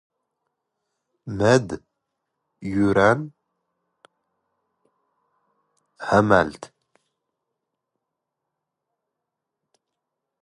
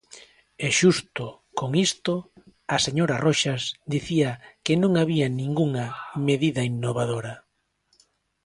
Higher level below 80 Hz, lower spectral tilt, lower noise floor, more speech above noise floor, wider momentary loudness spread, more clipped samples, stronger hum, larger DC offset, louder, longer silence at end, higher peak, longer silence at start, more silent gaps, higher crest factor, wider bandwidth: first, -54 dBFS vs -60 dBFS; about the same, -6 dB/octave vs -5 dB/octave; first, -83 dBFS vs -69 dBFS; first, 64 dB vs 45 dB; first, 20 LU vs 11 LU; neither; neither; neither; first, -20 LUFS vs -24 LUFS; first, 3.75 s vs 1.05 s; about the same, -2 dBFS vs -4 dBFS; first, 1.25 s vs 0.15 s; neither; first, 26 dB vs 20 dB; about the same, 11.5 kHz vs 11.5 kHz